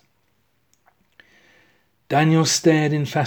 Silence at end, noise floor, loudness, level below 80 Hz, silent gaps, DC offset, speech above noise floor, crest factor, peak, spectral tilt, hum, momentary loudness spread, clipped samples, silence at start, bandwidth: 0 s; -67 dBFS; -18 LUFS; -68 dBFS; none; under 0.1%; 50 dB; 18 dB; -4 dBFS; -5 dB/octave; none; 5 LU; under 0.1%; 2.1 s; 19 kHz